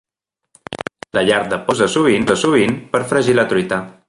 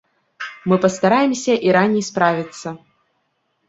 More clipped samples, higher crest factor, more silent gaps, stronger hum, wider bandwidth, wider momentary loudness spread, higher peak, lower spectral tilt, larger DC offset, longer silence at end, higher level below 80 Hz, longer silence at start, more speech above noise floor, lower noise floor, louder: neither; about the same, 16 dB vs 18 dB; neither; neither; first, 11.5 kHz vs 8 kHz; second, 13 LU vs 17 LU; about the same, -2 dBFS vs -2 dBFS; about the same, -4.5 dB/octave vs -5.5 dB/octave; neither; second, 0.15 s vs 0.9 s; first, -50 dBFS vs -62 dBFS; first, 0.7 s vs 0.4 s; first, 65 dB vs 52 dB; first, -80 dBFS vs -69 dBFS; about the same, -16 LUFS vs -17 LUFS